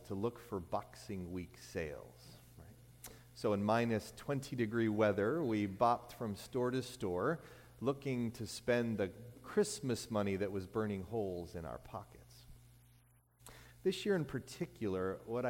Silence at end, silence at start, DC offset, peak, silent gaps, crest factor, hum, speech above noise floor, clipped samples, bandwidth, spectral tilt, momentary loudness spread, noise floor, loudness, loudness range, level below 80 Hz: 0 s; 0 s; under 0.1%; -18 dBFS; none; 20 dB; 60 Hz at -60 dBFS; 30 dB; under 0.1%; 17 kHz; -6 dB/octave; 21 LU; -68 dBFS; -38 LUFS; 8 LU; -64 dBFS